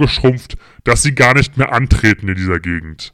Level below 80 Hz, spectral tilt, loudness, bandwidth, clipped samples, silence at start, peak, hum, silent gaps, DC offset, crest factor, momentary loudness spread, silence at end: -26 dBFS; -5 dB/octave; -13 LUFS; 13.5 kHz; under 0.1%; 0 s; -2 dBFS; none; none; under 0.1%; 12 dB; 12 LU; 0.05 s